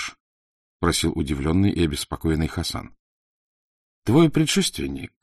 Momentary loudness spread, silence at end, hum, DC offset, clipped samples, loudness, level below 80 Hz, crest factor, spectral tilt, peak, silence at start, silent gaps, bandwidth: 12 LU; 0.15 s; none; under 0.1%; under 0.1%; -22 LUFS; -38 dBFS; 20 dB; -5 dB/octave; -4 dBFS; 0 s; 0.20-0.80 s, 2.99-4.02 s; 13 kHz